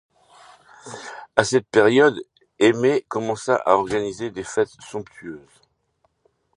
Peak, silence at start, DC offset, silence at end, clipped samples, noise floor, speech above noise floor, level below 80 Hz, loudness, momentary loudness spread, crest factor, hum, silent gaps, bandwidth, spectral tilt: 0 dBFS; 0.85 s; under 0.1%; 1.2 s; under 0.1%; -68 dBFS; 48 dB; -60 dBFS; -20 LUFS; 20 LU; 22 dB; none; none; 11 kHz; -4.5 dB/octave